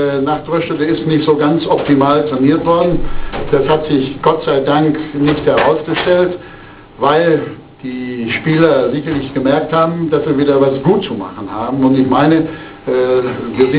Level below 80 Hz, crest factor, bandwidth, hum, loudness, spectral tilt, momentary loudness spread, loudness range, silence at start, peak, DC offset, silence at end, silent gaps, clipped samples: -36 dBFS; 14 dB; 4 kHz; none; -14 LUFS; -11 dB/octave; 11 LU; 2 LU; 0 s; 0 dBFS; under 0.1%; 0 s; none; under 0.1%